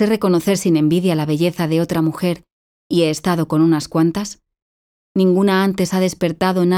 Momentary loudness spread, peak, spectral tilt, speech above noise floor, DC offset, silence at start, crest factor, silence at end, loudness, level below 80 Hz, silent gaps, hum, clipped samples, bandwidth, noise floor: 7 LU; -4 dBFS; -6 dB/octave; over 74 dB; under 0.1%; 0 s; 14 dB; 0 s; -17 LUFS; -52 dBFS; 2.52-2.90 s, 4.62-5.15 s; none; under 0.1%; 16.5 kHz; under -90 dBFS